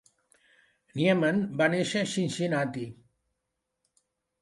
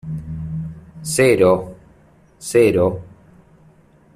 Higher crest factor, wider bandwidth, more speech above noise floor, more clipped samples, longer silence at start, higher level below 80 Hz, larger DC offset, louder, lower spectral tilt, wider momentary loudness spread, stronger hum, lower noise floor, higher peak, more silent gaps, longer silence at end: about the same, 20 dB vs 18 dB; second, 11.5 kHz vs 15 kHz; first, 56 dB vs 36 dB; neither; first, 0.95 s vs 0.05 s; second, -70 dBFS vs -48 dBFS; neither; second, -27 LUFS vs -17 LUFS; about the same, -5.5 dB/octave vs -5.5 dB/octave; second, 13 LU vs 20 LU; neither; first, -83 dBFS vs -51 dBFS; second, -10 dBFS vs -2 dBFS; neither; first, 1.5 s vs 1.05 s